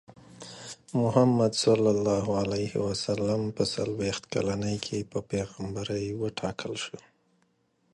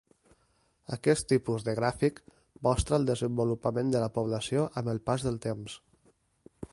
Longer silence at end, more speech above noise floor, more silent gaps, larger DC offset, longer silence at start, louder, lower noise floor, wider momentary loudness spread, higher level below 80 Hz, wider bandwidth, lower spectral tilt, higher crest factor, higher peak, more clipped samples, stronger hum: first, 0.95 s vs 0.1 s; about the same, 43 dB vs 41 dB; neither; neither; second, 0.1 s vs 0.9 s; about the same, -28 LUFS vs -30 LUFS; about the same, -71 dBFS vs -70 dBFS; first, 13 LU vs 9 LU; second, -56 dBFS vs -50 dBFS; about the same, 11.5 kHz vs 11.5 kHz; about the same, -5.5 dB/octave vs -6 dB/octave; about the same, 20 dB vs 20 dB; about the same, -10 dBFS vs -12 dBFS; neither; neither